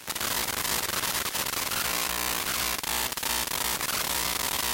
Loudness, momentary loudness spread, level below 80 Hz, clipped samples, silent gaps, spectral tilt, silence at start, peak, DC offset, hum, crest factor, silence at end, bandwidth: -27 LUFS; 1 LU; -50 dBFS; under 0.1%; none; -0.5 dB/octave; 0 s; -10 dBFS; under 0.1%; none; 20 dB; 0 s; 17.5 kHz